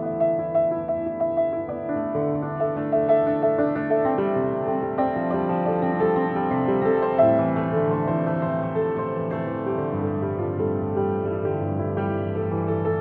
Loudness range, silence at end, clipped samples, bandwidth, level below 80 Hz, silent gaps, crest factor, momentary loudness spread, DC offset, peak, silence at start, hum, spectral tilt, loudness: 4 LU; 0 s; under 0.1%; 4.3 kHz; -56 dBFS; none; 16 dB; 6 LU; under 0.1%; -6 dBFS; 0 s; none; -11.5 dB/octave; -24 LUFS